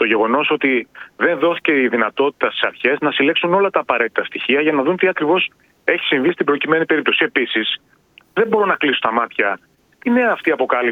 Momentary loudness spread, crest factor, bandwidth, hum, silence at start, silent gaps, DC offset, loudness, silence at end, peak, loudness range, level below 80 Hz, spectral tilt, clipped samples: 5 LU; 18 dB; 4.9 kHz; none; 0 s; none; under 0.1%; -17 LUFS; 0 s; 0 dBFS; 2 LU; -64 dBFS; -6.5 dB/octave; under 0.1%